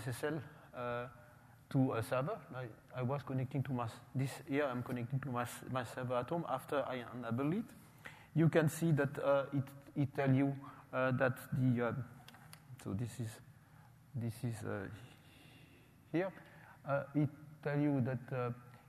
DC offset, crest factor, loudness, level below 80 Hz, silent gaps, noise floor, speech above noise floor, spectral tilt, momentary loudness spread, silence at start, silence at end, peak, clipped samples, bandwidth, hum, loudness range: under 0.1%; 20 dB; -38 LUFS; -72 dBFS; none; -62 dBFS; 25 dB; -7.5 dB/octave; 17 LU; 0 s; 0.1 s; -18 dBFS; under 0.1%; 15.5 kHz; none; 9 LU